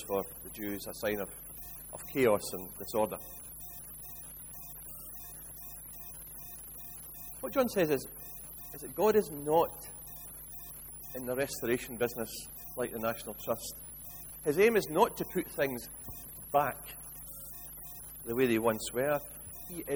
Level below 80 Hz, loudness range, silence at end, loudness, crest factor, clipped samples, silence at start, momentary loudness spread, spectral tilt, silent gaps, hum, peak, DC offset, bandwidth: -58 dBFS; 8 LU; 0 s; -35 LUFS; 22 dB; under 0.1%; 0 s; 15 LU; -4.5 dB/octave; none; none; -12 dBFS; under 0.1%; over 20 kHz